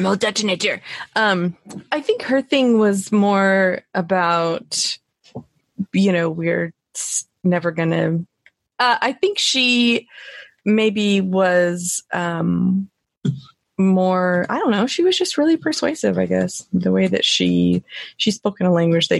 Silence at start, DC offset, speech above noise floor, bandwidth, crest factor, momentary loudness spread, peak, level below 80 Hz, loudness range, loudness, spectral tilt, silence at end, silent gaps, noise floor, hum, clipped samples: 0 s; under 0.1%; 40 dB; 12.5 kHz; 14 dB; 11 LU; -4 dBFS; -60 dBFS; 3 LU; -19 LUFS; -4.5 dB/octave; 0 s; 13.17-13.21 s; -58 dBFS; none; under 0.1%